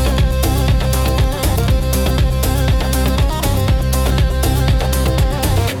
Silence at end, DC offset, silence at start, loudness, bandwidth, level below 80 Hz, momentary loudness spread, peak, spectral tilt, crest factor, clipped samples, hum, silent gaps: 0 s; under 0.1%; 0 s; -16 LUFS; 18 kHz; -16 dBFS; 1 LU; -4 dBFS; -5.5 dB/octave; 10 dB; under 0.1%; none; none